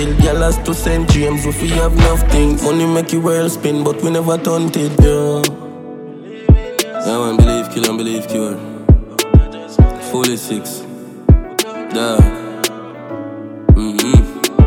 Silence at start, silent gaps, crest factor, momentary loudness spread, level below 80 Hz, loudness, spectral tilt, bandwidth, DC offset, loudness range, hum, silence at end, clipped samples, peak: 0 s; none; 14 dB; 13 LU; -18 dBFS; -15 LUFS; -6 dB/octave; 17.5 kHz; under 0.1%; 2 LU; none; 0 s; under 0.1%; 0 dBFS